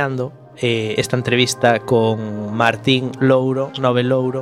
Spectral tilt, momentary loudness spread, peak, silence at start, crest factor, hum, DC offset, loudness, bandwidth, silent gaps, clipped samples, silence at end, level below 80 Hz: -5 dB/octave; 8 LU; 0 dBFS; 0 s; 18 dB; none; under 0.1%; -17 LUFS; 15 kHz; none; under 0.1%; 0 s; -58 dBFS